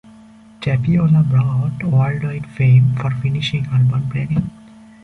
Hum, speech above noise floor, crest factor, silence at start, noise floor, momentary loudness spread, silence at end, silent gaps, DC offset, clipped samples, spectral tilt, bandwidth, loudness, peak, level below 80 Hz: none; 28 dB; 12 dB; 0.6 s; -43 dBFS; 8 LU; 0.55 s; none; under 0.1%; under 0.1%; -8.5 dB/octave; 6.4 kHz; -17 LUFS; -4 dBFS; -44 dBFS